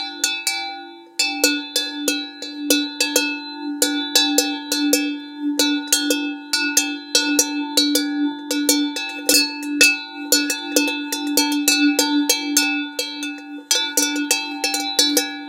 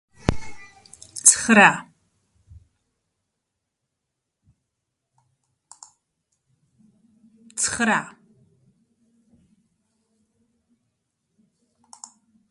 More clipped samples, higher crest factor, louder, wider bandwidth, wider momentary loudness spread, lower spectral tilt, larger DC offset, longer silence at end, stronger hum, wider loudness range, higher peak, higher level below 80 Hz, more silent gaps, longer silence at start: neither; second, 20 dB vs 28 dB; about the same, -18 LUFS vs -18 LUFS; first, 17 kHz vs 12 kHz; second, 10 LU vs 30 LU; second, 1.5 dB/octave vs -2.5 dB/octave; neither; second, 0 s vs 4.4 s; neither; second, 2 LU vs 11 LU; about the same, 0 dBFS vs 0 dBFS; second, -72 dBFS vs -48 dBFS; neither; second, 0 s vs 0.25 s